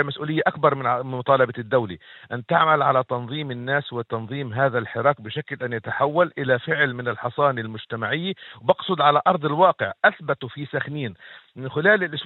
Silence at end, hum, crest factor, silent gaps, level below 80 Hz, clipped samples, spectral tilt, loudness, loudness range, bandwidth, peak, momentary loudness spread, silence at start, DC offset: 0 s; none; 22 dB; none; -68 dBFS; under 0.1%; -8.5 dB/octave; -22 LUFS; 2 LU; 4.2 kHz; -2 dBFS; 11 LU; 0 s; under 0.1%